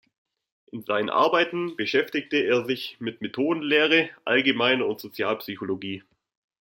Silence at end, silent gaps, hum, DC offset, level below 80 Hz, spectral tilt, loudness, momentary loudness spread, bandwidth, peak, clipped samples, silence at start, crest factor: 0.6 s; none; none; under 0.1%; -74 dBFS; -5 dB/octave; -24 LUFS; 12 LU; 16.5 kHz; -6 dBFS; under 0.1%; 0.75 s; 20 dB